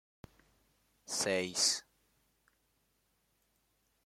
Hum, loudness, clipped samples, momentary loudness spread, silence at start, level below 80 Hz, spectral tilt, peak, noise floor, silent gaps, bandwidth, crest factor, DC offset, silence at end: none; -33 LUFS; under 0.1%; 9 LU; 1.1 s; -76 dBFS; -1 dB/octave; -18 dBFS; -77 dBFS; none; 16.5 kHz; 22 dB; under 0.1%; 2.25 s